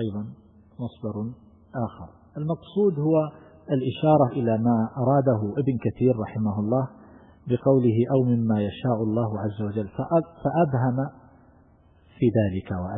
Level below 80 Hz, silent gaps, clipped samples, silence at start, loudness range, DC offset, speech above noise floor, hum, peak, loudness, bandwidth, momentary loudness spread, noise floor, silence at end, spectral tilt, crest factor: -56 dBFS; none; under 0.1%; 0 s; 5 LU; under 0.1%; 33 dB; none; -6 dBFS; -24 LUFS; 3.9 kHz; 13 LU; -56 dBFS; 0 s; -13 dB/octave; 18 dB